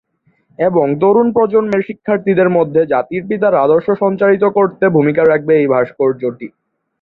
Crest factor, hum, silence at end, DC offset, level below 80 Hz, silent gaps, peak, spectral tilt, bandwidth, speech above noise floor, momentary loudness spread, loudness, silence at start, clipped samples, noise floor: 12 dB; none; 0.55 s; under 0.1%; -56 dBFS; none; -2 dBFS; -10 dB/octave; 4.5 kHz; 44 dB; 7 LU; -13 LUFS; 0.6 s; under 0.1%; -57 dBFS